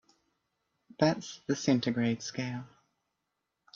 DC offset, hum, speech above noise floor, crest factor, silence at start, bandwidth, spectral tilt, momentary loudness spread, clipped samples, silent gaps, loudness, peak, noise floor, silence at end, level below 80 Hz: under 0.1%; none; 53 dB; 22 dB; 1 s; 7.6 kHz; -5.5 dB/octave; 9 LU; under 0.1%; none; -31 LUFS; -12 dBFS; -84 dBFS; 1.1 s; -70 dBFS